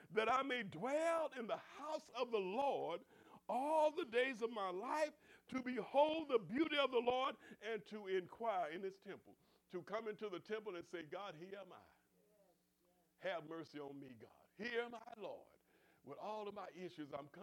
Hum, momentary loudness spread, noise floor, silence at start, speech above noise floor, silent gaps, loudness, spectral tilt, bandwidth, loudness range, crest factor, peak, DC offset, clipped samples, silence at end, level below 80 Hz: none; 16 LU; -79 dBFS; 0 s; 36 dB; none; -43 LUFS; -4.5 dB/octave; 16 kHz; 12 LU; 22 dB; -22 dBFS; under 0.1%; under 0.1%; 0 s; -86 dBFS